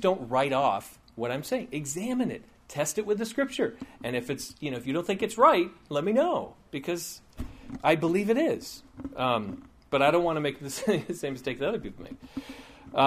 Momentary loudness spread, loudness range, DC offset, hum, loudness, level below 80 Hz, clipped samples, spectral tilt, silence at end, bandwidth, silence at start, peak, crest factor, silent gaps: 17 LU; 4 LU; under 0.1%; none; -28 LUFS; -56 dBFS; under 0.1%; -4.5 dB/octave; 0 s; 15.5 kHz; 0 s; -6 dBFS; 22 dB; none